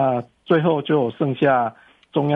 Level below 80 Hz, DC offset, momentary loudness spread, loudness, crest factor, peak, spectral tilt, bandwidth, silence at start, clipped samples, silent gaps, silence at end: -62 dBFS; under 0.1%; 8 LU; -20 LUFS; 14 dB; -6 dBFS; -9.5 dB/octave; 4.9 kHz; 0 s; under 0.1%; none; 0 s